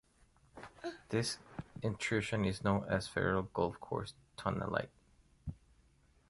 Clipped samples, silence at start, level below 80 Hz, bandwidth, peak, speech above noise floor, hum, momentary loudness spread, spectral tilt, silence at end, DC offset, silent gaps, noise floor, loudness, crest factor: under 0.1%; 0.55 s; -58 dBFS; 11.5 kHz; -16 dBFS; 32 dB; none; 15 LU; -5.5 dB/octave; 0.75 s; under 0.1%; none; -69 dBFS; -37 LUFS; 22 dB